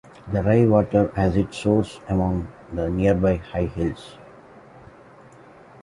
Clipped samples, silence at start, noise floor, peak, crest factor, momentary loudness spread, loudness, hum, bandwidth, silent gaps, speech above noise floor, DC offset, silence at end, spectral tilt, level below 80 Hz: under 0.1%; 0.25 s; -47 dBFS; -4 dBFS; 18 dB; 11 LU; -22 LUFS; none; 11.5 kHz; none; 27 dB; under 0.1%; 1.6 s; -8.5 dB/octave; -38 dBFS